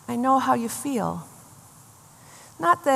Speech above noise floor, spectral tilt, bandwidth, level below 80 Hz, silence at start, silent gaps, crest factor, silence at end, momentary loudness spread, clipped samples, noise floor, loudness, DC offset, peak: 28 dB; -4.5 dB/octave; 15 kHz; -68 dBFS; 0.1 s; none; 20 dB; 0 s; 19 LU; under 0.1%; -50 dBFS; -24 LUFS; under 0.1%; -6 dBFS